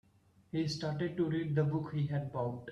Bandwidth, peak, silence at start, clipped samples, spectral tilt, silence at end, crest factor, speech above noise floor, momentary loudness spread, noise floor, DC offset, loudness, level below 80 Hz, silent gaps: 9.6 kHz; -20 dBFS; 0.55 s; under 0.1%; -7.5 dB/octave; 0 s; 16 dB; 33 dB; 5 LU; -67 dBFS; under 0.1%; -35 LUFS; -68 dBFS; none